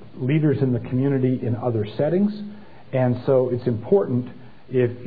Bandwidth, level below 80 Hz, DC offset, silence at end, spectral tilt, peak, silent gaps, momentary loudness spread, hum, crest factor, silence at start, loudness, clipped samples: 4.9 kHz; -58 dBFS; 0.8%; 0 s; -12 dB/octave; -6 dBFS; none; 7 LU; none; 16 dB; 0 s; -22 LUFS; under 0.1%